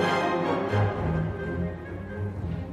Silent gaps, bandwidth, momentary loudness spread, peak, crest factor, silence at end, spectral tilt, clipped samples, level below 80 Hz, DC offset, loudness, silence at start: none; 12 kHz; 9 LU; -12 dBFS; 16 dB; 0 s; -7 dB/octave; under 0.1%; -40 dBFS; under 0.1%; -29 LUFS; 0 s